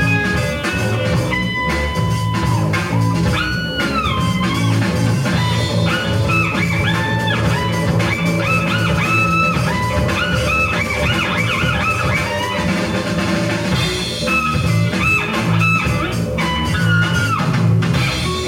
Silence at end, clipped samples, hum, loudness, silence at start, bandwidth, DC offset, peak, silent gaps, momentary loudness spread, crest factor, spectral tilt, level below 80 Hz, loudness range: 0 s; under 0.1%; none; -16 LUFS; 0 s; 16.5 kHz; under 0.1%; -4 dBFS; none; 4 LU; 12 dB; -5.5 dB/octave; -32 dBFS; 2 LU